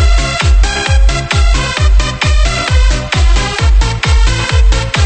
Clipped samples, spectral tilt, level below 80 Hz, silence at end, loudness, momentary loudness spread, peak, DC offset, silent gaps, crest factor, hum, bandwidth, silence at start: under 0.1%; -4 dB/octave; -10 dBFS; 0 s; -12 LUFS; 1 LU; 0 dBFS; 0.8%; none; 10 dB; none; 8.8 kHz; 0 s